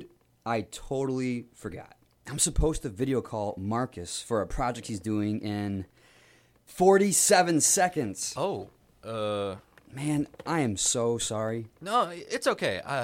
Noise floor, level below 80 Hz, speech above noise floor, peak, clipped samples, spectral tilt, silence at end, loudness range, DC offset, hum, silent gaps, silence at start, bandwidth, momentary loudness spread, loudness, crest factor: -60 dBFS; -44 dBFS; 32 dB; -8 dBFS; under 0.1%; -3.5 dB/octave; 0 s; 7 LU; under 0.1%; none; none; 0 s; 16.5 kHz; 17 LU; -28 LUFS; 20 dB